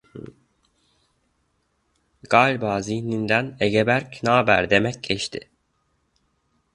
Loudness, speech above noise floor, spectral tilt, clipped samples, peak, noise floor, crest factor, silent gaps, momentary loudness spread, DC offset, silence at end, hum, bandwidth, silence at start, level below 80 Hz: -21 LUFS; 49 dB; -5 dB/octave; under 0.1%; 0 dBFS; -70 dBFS; 24 dB; none; 11 LU; under 0.1%; 1.35 s; none; 11.5 kHz; 0.15 s; -54 dBFS